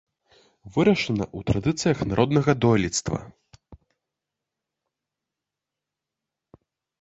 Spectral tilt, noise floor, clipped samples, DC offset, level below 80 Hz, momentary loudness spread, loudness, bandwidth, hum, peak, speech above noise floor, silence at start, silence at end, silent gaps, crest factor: -5.5 dB/octave; -87 dBFS; under 0.1%; under 0.1%; -48 dBFS; 8 LU; -23 LUFS; 8.4 kHz; none; -4 dBFS; 64 dB; 0.65 s; 3.25 s; none; 22 dB